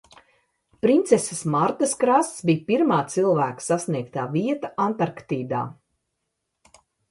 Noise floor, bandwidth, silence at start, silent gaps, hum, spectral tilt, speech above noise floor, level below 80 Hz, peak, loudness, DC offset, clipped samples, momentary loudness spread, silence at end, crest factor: -79 dBFS; 11.5 kHz; 0.85 s; none; none; -5.5 dB/octave; 57 dB; -66 dBFS; -4 dBFS; -23 LUFS; under 0.1%; under 0.1%; 8 LU; 1.4 s; 20 dB